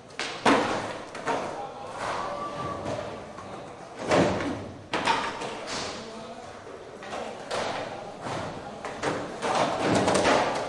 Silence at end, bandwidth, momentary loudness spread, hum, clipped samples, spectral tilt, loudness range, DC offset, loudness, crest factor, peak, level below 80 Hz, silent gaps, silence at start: 0 s; 11.5 kHz; 17 LU; none; under 0.1%; -4 dB/octave; 6 LU; under 0.1%; -29 LUFS; 22 dB; -6 dBFS; -58 dBFS; none; 0 s